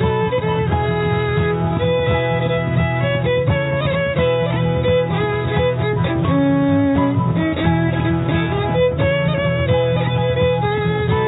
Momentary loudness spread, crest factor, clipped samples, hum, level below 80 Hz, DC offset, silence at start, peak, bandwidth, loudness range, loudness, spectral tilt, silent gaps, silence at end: 2 LU; 12 dB; under 0.1%; none; -34 dBFS; under 0.1%; 0 s; -4 dBFS; 4 kHz; 1 LU; -18 LUFS; -11 dB/octave; none; 0 s